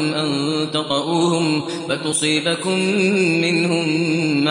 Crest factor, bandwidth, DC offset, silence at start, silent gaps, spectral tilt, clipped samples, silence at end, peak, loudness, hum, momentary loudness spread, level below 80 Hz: 14 dB; 11.5 kHz; under 0.1%; 0 s; none; -4.5 dB/octave; under 0.1%; 0 s; -4 dBFS; -18 LUFS; none; 4 LU; -66 dBFS